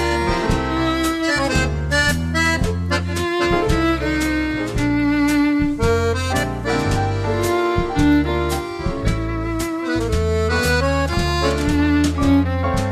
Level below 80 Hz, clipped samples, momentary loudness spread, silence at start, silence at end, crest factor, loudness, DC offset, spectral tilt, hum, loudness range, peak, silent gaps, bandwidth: -28 dBFS; under 0.1%; 5 LU; 0 s; 0 s; 14 dB; -19 LUFS; under 0.1%; -5.5 dB/octave; none; 2 LU; -4 dBFS; none; 14 kHz